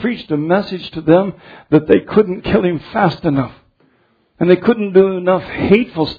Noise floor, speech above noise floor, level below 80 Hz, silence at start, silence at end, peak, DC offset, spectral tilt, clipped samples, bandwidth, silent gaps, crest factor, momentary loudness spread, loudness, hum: -58 dBFS; 43 dB; -44 dBFS; 0 s; 0.05 s; 0 dBFS; under 0.1%; -9.5 dB/octave; under 0.1%; 5 kHz; none; 14 dB; 8 LU; -15 LUFS; none